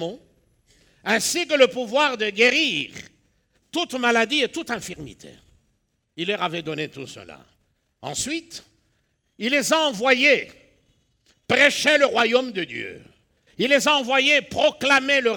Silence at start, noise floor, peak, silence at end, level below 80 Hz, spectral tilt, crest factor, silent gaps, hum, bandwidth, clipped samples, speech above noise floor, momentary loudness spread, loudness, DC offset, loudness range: 0 s; -70 dBFS; -2 dBFS; 0 s; -62 dBFS; -2 dB/octave; 20 dB; none; none; over 20 kHz; under 0.1%; 49 dB; 19 LU; -20 LUFS; under 0.1%; 11 LU